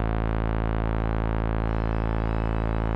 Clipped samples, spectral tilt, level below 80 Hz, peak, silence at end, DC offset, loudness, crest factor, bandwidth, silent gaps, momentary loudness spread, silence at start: under 0.1%; -10 dB/octave; -28 dBFS; -12 dBFS; 0 s; under 0.1%; -27 LUFS; 14 dB; 4.6 kHz; none; 0 LU; 0 s